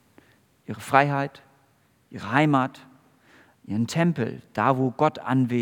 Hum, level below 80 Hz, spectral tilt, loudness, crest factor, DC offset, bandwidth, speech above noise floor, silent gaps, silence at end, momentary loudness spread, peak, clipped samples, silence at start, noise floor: none; -72 dBFS; -7 dB/octave; -24 LUFS; 24 dB; under 0.1%; 18 kHz; 40 dB; none; 0 s; 14 LU; -2 dBFS; under 0.1%; 0.7 s; -63 dBFS